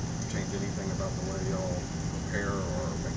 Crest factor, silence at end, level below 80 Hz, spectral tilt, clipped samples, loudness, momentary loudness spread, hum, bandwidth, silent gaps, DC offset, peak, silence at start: 16 dB; 0 s; -42 dBFS; -5.5 dB/octave; under 0.1%; -33 LUFS; 2 LU; none; 8 kHz; none; under 0.1%; -18 dBFS; 0 s